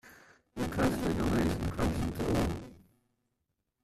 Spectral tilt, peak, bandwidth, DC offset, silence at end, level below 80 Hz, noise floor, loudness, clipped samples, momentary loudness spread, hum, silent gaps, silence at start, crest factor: -6.5 dB/octave; -18 dBFS; 14.5 kHz; under 0.1%; 1.05 s; -44 dBFS; -83 dBFS; -32 LUFS; under 0.1%; 11 LU; none; none; 0.05 s; 16 dB